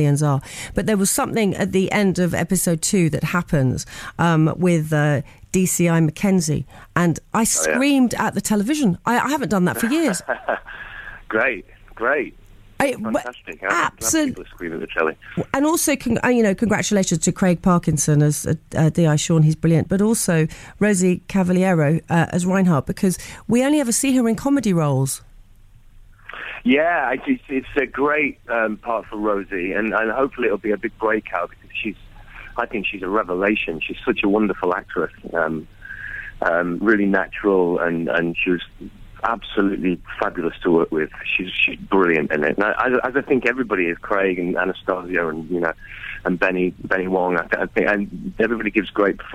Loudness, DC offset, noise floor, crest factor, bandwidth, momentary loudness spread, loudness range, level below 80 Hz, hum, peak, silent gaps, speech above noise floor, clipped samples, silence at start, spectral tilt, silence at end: -20 LUFS; under 0.1%; -47 dBFS; 16 dB; 16 kHz; 9 LU; 4 LU; -44 dBFS; none; -4 dBFS; none; 27 dB; under 0.1%; 0 s; -5 dB/octave; 0 s